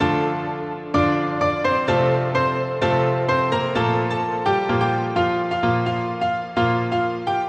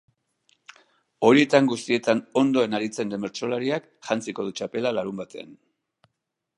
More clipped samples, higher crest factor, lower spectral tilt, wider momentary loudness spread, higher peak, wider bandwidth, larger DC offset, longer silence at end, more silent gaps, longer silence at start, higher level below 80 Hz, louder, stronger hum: neither; second, 14 dB vs 24 dB; first, -7 dB/octave vs -5 dB/octave; second, 4 LU vs 13 LU; second, -6 dBFS vs -2 dBFS; second, 9 kHz vs 11 kHz; neither; second, 0 s vs 1.05 s; neither; second, 0 s vs 1.2 s; first, -48 dBFS vs -72 dBFS; first, -21 LUFS vs -24 LUFS; neither